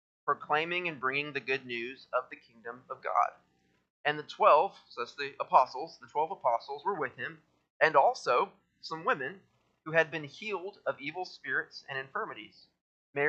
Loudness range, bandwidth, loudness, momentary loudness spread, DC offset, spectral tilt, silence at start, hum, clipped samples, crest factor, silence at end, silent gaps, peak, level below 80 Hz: 5 LU; 8.4 kHz; -31 LUFS; 15 LU; under 0.1%; -4.5 dB/octave; 0.25 s; none; under 0.1%; 24 dB; 0 s; 3.90-4.04 s, 7.70-7.80 s, 12.81-13.13 s; -8 dBFS; -86 dBFS